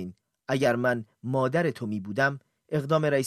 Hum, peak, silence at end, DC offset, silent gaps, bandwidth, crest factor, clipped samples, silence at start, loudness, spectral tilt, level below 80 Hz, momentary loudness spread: none; -10 dBFS; 0 s; under 0.1%; none; 14 kHz; 18 dB; under 0.1%; 0 s; -27 LUFS; -6.5 dB/octave; -68 dBFS; 11 LU